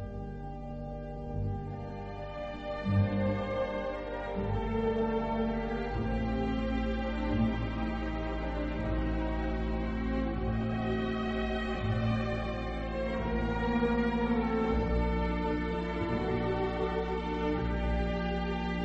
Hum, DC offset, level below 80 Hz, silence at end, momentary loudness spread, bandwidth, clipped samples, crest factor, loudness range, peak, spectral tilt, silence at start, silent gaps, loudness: none; under 0.1%; -38 dBFS; 0 s; 9 LU; 7.6 kHz; under 0.1%; 14 dB; 3 LU; -18 dBFS; -8.5 dB/octave; 0 s; none; -33 LUFS